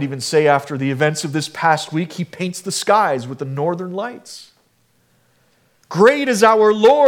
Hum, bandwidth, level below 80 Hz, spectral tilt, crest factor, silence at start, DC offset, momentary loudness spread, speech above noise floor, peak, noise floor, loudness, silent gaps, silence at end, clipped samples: none; 16.5 kHz; -68 dBFS; -4.5 dB/octave; 16 dB; 0 s; under 0.1%; 15 LU; 44 dB; 0 dBFS; -60 dBFS; -17 LUFS; none; 0 s; under 0.1%